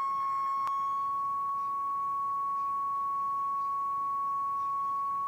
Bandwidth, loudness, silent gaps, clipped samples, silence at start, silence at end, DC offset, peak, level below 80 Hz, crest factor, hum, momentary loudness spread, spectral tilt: 16 kHz; -31 LUFS; none; under 0.1%; 0 s; 0 s; under 0.1%; -26 dBFS; -74 dBFS; 6 dB; none; 1 LU; -4 dB/octave